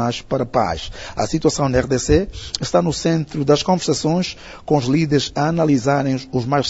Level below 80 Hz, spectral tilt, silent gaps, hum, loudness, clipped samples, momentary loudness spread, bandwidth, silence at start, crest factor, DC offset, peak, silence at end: -38 dBFS; -5.5 dB/octave; none; none; -19 LUFS; under 0.1%; 8 LU; 8 kHz; 0 s; 18 dB; under 0.1%; 0 dBFS; 0 s